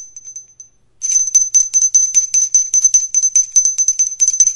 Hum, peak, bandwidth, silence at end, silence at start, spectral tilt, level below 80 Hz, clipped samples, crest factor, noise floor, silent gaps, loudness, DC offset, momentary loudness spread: none; 0 dBFS; 12 kHz; 0 s; 0 s; 4.5 dB/octave; -54 dBFS; under 0.1%; 14 dB; -44 dBFS; none; -10 LUFS; under 0.1%; 4 LU